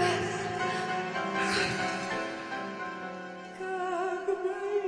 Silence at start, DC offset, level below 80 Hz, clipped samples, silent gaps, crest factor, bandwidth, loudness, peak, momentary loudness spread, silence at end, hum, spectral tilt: 0 s; under 0.1%; -64 dBFS; under 0.1%; none; 16 dB; 10.5 kHz; -32 LUFS; -16 dBFS; 10 LU; 0 s; none; -4 dB/octave